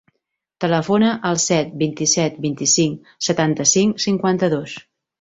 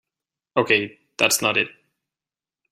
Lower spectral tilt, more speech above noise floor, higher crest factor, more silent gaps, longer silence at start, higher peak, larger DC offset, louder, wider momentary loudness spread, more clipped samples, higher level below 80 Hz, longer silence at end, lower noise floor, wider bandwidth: first, -3.5 dB/octave vs -2 dB/octave; second, 58 dB vs over 69 dB; second, 16 dB vs 22 dB; neither; about the same, 0.6 s vs 0.55 s; about the same, -2 dBFS vs -2 dBFS; neither; about the same, -18 LUFS vs -20 LUFS; about the same, 9 LU vs 10 LU; neither; first, -58 dBFS vs -66 dBFS; second, 0.4 s vs 1 s; second, -76 dBFS vs under -90 dBFS; second, 8.2 kHz vs 15.5 kHz